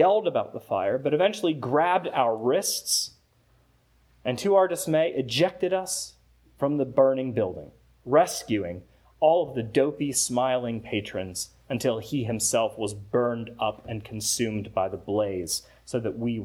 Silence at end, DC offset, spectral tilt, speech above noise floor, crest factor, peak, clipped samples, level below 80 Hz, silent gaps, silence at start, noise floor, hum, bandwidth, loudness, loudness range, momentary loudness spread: 0 s; under 0.1%; -4 dB/octave; 37 dB; 18 dB; -8 dBFS; under 0.1%; -60 dBFS; none; 0 s; -63 dBFS; none; over 20 kHz; -26 LUFS; 3 LU; 10 LU